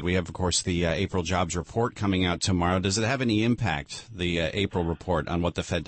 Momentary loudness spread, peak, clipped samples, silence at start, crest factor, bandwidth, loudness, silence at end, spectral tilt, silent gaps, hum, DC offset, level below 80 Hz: 5 LU; -12 dBFS; under 0.1%; 0 s; 14 dB; 8.8 kHz; -26 LUFS; 0.05 s; -4.5 dB/octave; none; none; under 0.1%; -44 dBFS